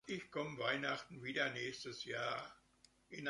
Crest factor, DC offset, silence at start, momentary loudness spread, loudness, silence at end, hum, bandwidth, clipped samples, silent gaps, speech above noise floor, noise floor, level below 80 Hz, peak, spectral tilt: 20 dB; under 0.1%; 0.05 s; 8 LU; -42 LUFS; 0 s; none; 11.5 kHz; under 0.1%; none; 29 dB; -72 dBFS; -78 dBFS; -24 dBFS; -4 dB/octave